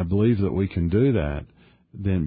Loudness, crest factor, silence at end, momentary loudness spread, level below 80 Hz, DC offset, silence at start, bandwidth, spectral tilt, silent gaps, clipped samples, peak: -23 LUFS; 14 dB; 0 s; 10 LU; -36 dBFS; under 0.1%; 0 s; 4.9 kHz; -13 dB/octave; none; under 0.1%; -8 dBFS